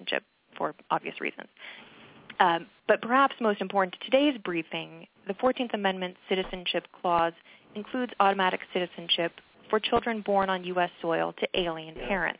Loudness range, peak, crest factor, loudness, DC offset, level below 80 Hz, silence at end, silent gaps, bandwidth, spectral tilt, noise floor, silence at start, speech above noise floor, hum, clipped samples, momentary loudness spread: 3 LU; -6 dBFS; 24 dB; -28 LUFS; under 0.1%; -60 dBFS; 0.05 s; none; 4 kHz; -2 dB/octave; -50 dBFS; 0 s; 22 dB; none; under 0.1%; 12 LU